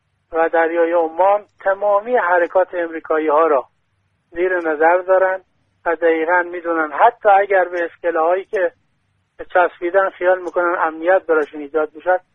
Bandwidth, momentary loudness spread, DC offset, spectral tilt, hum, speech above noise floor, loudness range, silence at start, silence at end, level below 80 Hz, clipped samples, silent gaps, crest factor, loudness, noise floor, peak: 3.9 kHz; 7 LU; under 0.1%; -6 dB/octave; none; 49 dB; 2 LU; 0.3 s; 0.15 s; -60 dBFS; under 0.1%; none; 16 dB; -17 LUFS; -65 dBFS; 0 dBFS